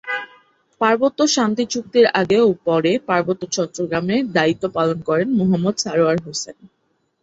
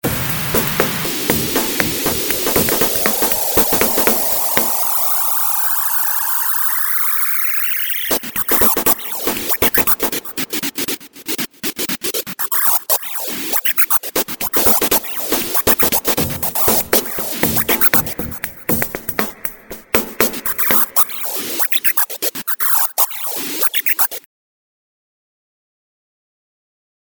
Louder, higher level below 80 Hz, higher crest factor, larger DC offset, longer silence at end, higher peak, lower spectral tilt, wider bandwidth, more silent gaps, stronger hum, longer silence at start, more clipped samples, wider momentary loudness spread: second, -18 LUFS vs -14 LUFS; second, -58 dBFS vs -44 dBFS; about the same, 18 dB vs 18 dB; neither; second, 0.7 s vs 3 s; about the same, -2 dBFS vs 0 dBFS; first, -4.5 dB/octave vs -2 dB/octave; second, 8 kHz vs over 20 kHz; neither; neither; about the same, 0.05 s vs 0.05 s; neither; about the same, 8 LU vs 8 LU